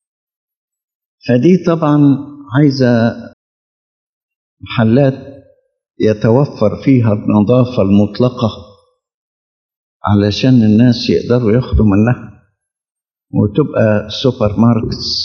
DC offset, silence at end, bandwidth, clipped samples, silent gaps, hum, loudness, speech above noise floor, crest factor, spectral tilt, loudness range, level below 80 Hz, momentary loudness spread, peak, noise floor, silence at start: under 0.1%; 0 s; 6.8 kHz; under 0.1%; 3.33-4.29 s, 4.36-4.57 s, 9.14-9.69 s, 9.76-10.00 s; none; -12 LUFS; 77 dB; 14 dB; -8 dB/octave; 3 LU; -34 dBFS; 8 LU; 0 dBFS; -88 dBFS; 1.25 s